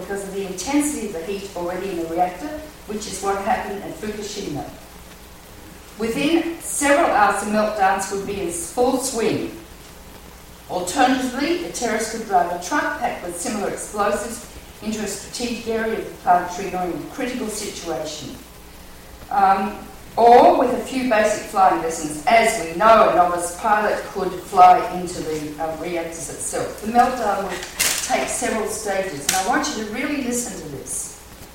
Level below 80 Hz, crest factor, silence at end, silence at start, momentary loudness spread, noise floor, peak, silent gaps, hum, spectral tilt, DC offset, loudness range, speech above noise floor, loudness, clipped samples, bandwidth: -46 dBFS; 20 dB; 0 s; 0 s; 15 LU; -41 dBFS; 0 dBFS; none; none; -3 dB/octave; under 0.1%; 9 LU; 21 dB; -20 LUFS; under 0.1%; 16.5 kHz